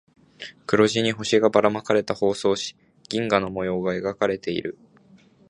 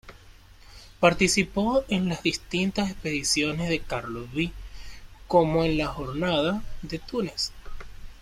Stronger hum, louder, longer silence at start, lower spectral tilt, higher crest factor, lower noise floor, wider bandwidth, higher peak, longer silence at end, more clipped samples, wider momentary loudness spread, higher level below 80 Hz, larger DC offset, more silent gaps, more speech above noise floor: neither; first, -23 LUFS vs -26 LUFS; first, 0.4 s vs 0.05 s; about the same, -4.5 dB/octave vs -4.5 dB/octave; about the same, 22 dB vs 22 dB; first, -54 dBFS vs -50 dBFS; second, 10.5 kHz vs 15.5 kHz; about the same, -2 dBFS vs -4 dBFS; first, 0.8 s vs 0 s; neither; about the same, 13 LU vs 15 LU; second, -58 dBFS vs -42 dBFS; neither; neither; first, 32 dB vs 24 dB